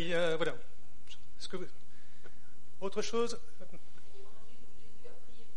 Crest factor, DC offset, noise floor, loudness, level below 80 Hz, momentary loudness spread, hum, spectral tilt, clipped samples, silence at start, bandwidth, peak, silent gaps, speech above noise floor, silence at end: 22 dB; 4%; -62 dBFS; -37 LUFS; -66 dBFS; 27 LU; 50 Hz at -70 dBFS; -4 dB/octave; under 0.1%; 0 s; 10.5 kHz; -18 dBFS; none; 26 dB; 0.15 s